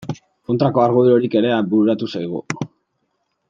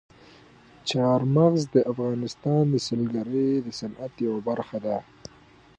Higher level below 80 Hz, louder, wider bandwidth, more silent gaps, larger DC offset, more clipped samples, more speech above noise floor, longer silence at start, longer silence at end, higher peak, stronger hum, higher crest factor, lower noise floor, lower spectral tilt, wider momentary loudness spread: about the same, -60 dBFS vs -62 dBFS; first, -17 LUFS vs -25 LUFS; second, 7.6 kHz vs 9.8 kHz; neither; neither; neither; first, 54 dB vs 30 dB; second, 0 s vs 0.85 s; about the same, 0.85 s vs 0.75 s; first, -2 dBFS vs -8 dBFS; neither; about the same, 18 dB vs 18 dB; first, -70 dBFS vs -54 dBFS; about the same, -7.5 dB/octave vs -7 dB/octave; about the same, 15 LU vs 13 LU